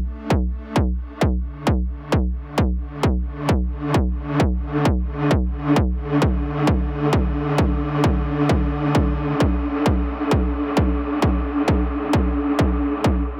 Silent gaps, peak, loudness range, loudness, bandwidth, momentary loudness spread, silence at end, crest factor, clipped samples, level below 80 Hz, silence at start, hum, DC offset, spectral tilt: none; -6 dBFS; 2 LU; -21 LUFS; 12.5 kHz; 3 LU; 0 s; 14 dB; under 0.1%; -24 dBFS; 0 s; none; under 0.1%; -7.5 dB/octave